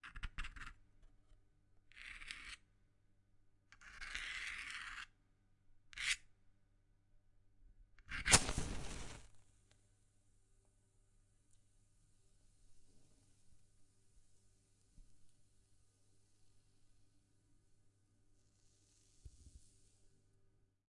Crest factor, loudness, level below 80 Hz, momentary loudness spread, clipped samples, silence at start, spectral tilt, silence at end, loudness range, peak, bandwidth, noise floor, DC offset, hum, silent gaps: 38 dB; -40 LUFS; -58 dBFS; 26 LU; under 0.1%; 0.05 s; -1.5 dB/octave; 0.85 s; 17 LU; -10 dBFS; 11.5 kHz; -74 dBFS; under 0.1%; none; none